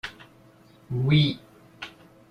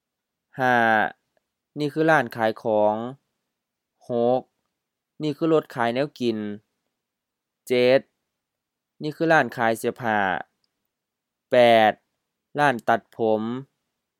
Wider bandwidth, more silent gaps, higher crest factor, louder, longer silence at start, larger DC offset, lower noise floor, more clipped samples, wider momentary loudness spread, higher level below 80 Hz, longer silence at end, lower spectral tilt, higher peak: second, 6.4 kHz vs 16.5 kHz; neither; about the same, 18 dB vs 22 dB; about the same, -24 LUFS vs -22 LUFS; second, 0.05 s vs 0.55 s; neither; second, -54 dBFS vs -84 dBFS; neither; first, 20 LU vs 15 LU; first, -56 dBFS vs -76 dBFS; second, 0.4 s vs 0.55 s; first, -7.5 dB/octave vs -5.5 dB/octave; second, -10 dBFS vs -2 dBFS